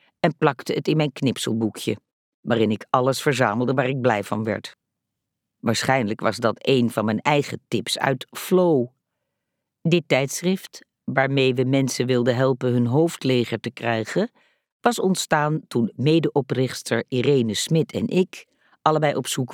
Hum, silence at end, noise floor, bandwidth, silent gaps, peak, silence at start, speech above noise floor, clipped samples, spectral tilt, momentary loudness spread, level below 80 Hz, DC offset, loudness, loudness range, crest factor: none; 0 s; -81 dBFS; 18 kHz; 2.13-2.43 s, 14.72-14.80 s; -4 dBFS; 0.25 s; 60 dB; under 0.1%; -5.5 dB/octave; 8 LU; -68 dBFS; under 0.1%; -22 LUFS; 2 LU; 20 dB